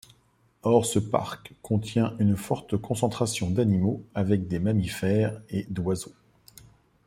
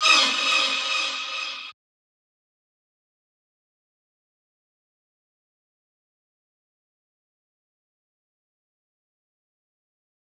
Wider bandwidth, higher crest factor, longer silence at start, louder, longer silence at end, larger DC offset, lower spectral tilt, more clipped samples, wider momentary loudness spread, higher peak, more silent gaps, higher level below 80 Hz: first, 16 kHz vs 13.5 kHz; second, 20 dB vs 26 dB; first, 0.65 s vs 0 s; second, -27 LUFS vs -21 LUFS; second, 1 s vs 8.55 s; neither; first, -6.5 dB/octave vs 2.5 dB/octave; neither; second, 9 LU vs 17 LU; about the same, -6 dBFS vs -6 dBFS; neither; first, -56 dBFS vs under -90 dBFS